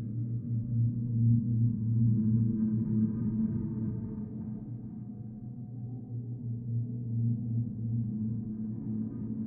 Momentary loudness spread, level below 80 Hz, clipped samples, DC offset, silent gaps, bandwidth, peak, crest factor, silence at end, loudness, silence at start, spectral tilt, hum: 14 LU; -56 dBFS; under 0.1%; under 0.1%; none; 1.6 kHz; -16 dBFS; 14 dB; 0 s; -32 LUFS; 0 s; -16.5 dB/octave; none